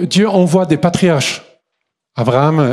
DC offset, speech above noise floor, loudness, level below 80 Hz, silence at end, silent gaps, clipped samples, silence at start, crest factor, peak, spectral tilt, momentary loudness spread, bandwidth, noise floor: under 0.1%; 62 dB; -13 LUFS; -50 dBFS; 0 s; none; under 0.1%; 0 s; 14 dB; 0 dBFS; -6 dB/octave; 8 LU; 13 kHz; -74 dBFS